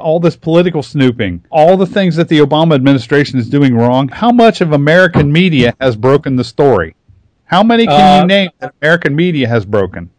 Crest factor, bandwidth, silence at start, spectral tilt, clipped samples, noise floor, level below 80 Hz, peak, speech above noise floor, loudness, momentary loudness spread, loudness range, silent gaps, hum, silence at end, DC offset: 10 dB; 11 kHz; 0 s; -7 dB/octave; 2%; -48 dBFS; -40 dBFS; 0 dBFS; 38 dB; -10 LUFS; 6 LU; 1 LU; none; none; 0.1 s; under 0.1%